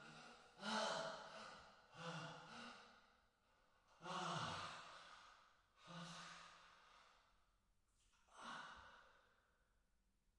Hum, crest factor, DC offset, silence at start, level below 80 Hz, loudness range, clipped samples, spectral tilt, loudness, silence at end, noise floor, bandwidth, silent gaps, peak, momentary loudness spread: none; 22 dB; under 0.1%; 0 s; -84 dBFS; 11 LU; under 0.1%; -3.5 dB/octave; -52 LUFS; 1.05 s; -83 dBFS; 11 kHz; none; -32 dBFS; 21 LU